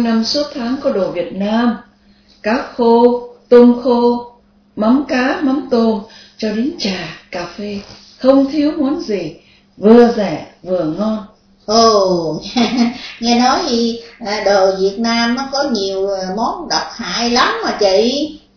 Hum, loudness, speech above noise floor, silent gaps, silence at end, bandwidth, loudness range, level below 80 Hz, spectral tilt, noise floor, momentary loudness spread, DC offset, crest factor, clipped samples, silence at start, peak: none; -14 LUFS; 35 dB; none; 0.2 s; 5.4 kHz; 4 LU; -48 dBFS; -4.5 dB/octave; -49 dBFS; 13 LU; under 0.1%; 14 dB; 0.2%; 0 s; 0 dBFS